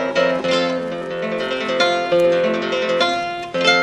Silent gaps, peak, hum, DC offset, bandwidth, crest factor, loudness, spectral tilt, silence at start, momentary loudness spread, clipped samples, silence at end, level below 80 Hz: none; -2 dBFS; none; under 0.1%; 10.5 kHz; 16 dB; -19 LUFS; -4 dB/octave; 0 s; 8 LU; under 0.1%; 0 s; -56 dBFS